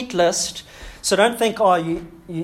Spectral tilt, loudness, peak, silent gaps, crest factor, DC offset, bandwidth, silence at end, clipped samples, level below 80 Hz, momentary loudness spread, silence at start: -3 dB/octave; -19 LUFS; -2 dBFS; none; 18 dB; under 0.1%; 16.5 kHz; 0 s; under 0.1%; -48 dBFS; 15 LU; 0 s